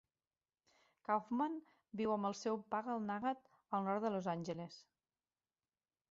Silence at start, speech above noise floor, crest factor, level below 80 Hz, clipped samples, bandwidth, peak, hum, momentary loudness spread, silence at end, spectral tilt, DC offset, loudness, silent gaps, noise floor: 1.1 s; over 50 dB; 20 dB; -82 dBFS; under 0.1%; 7.6 kHz; -24 dBFS; none; 12 LU; 1.3 s; -5.5 dB/octave; under 0.1%; -41 LUFS; none; under -90 dBFS